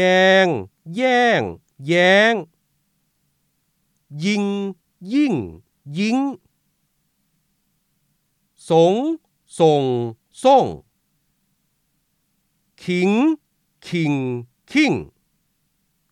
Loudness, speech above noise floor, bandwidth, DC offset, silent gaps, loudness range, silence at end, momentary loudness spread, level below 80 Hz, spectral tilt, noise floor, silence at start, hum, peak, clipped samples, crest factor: -18 LUFS; 51 dB; 12 kHz; under 0.1%; none; 6 LU; 1.05 s; 17 LU; -62 dBFS; -5.5 dB/octave; -69 dBFS; 0 s; none; -2 dBFS; under 0.1%; 18 dB